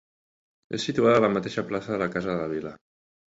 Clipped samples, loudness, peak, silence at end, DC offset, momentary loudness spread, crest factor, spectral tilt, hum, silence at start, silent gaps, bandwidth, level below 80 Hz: under 0.1%; -26 LUFS; -6 dBFS; 0.5 s; under 0.1%; 13 LU; 20 dB; -6 dB/octave; none; 0.7 s; none; 8 kHz; -60 dBFS